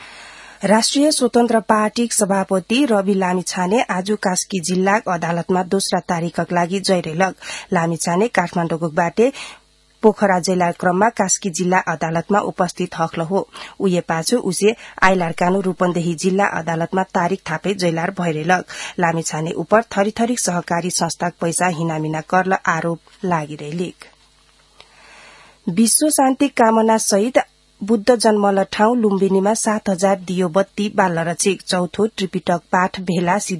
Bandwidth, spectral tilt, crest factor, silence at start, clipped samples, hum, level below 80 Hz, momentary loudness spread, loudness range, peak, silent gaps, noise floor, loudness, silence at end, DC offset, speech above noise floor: 12 kHz; -4.5 dB/octave; 18 dB; 0 s; under 0.1%; none; -54 dBFS; 7 LU; 4 LU; 0 dBFS; none; -54 dBFS; -18 LUFS; 0 s; under 0.1%; 36 dB